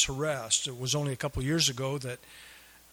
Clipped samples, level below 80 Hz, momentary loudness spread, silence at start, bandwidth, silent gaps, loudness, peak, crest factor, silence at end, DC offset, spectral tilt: under 0.1%; -52 dBFS; 20 LU; 0 s; over 20 kHz; none; -29 LUFS; -10 dBFS; 20 dB; 0.25 s; under 0.1%; -3 dB/octave